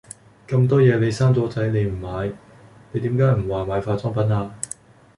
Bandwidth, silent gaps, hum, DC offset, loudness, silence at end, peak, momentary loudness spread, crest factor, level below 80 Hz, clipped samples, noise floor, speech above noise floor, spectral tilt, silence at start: 11.5 kHz; none; none; under 0.1%; -21 LUFS; 0.5 s; -4 dBFS; 15 LU; 18 dB; -44 dBFS; under 0.1%; -41 dBFS; 22 dB; -7.5 dB/octave; 0.5 s